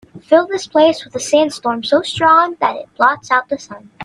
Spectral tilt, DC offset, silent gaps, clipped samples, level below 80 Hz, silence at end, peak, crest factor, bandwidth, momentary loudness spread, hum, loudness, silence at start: -3.5 dB/octave; under 0.1%; none; under 0.1%; -58 dBFS; 0 s; 0 dBFS; 14 dB; 11.5 kHz; 10 LU; none; -15 LUFS; 0.15 s